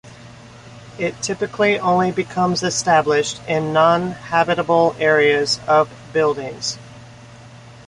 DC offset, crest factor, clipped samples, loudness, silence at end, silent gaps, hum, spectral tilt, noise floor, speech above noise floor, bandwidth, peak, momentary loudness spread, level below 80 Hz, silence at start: under 0.1%; 18 dB; under 0.1%; -18 LUFS; 0.15 s; none; none; -4 dB/octave; -41 dBFS; 23 dB; 11.5 kHz; -2 dBFS; 10 LU; -54 dBFS; 0.05 s